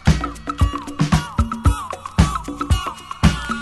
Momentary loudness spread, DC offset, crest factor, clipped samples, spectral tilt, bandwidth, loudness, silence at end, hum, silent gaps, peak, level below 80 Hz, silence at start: 7 LU; under 0.1%; 20 dB; under 0.1%; -5.5 dB/octave; 12.5 kHz; -21 LUFS; 0 s; none; none; 0 dBFS; -24 dBFS; 0.05 s